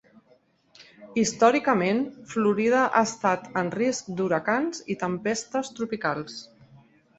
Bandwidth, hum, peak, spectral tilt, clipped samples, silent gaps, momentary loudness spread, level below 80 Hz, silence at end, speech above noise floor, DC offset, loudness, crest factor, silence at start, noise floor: 8.2 kHz; none; -6 dBFS; -4.5 dB/octave; under 0.1%; none; 10 LU; -66 dBFS; 0.75 s; 37 dB; under 0.1%; -25 LUFS; 20 dB; 0.8 s; -62 dBFS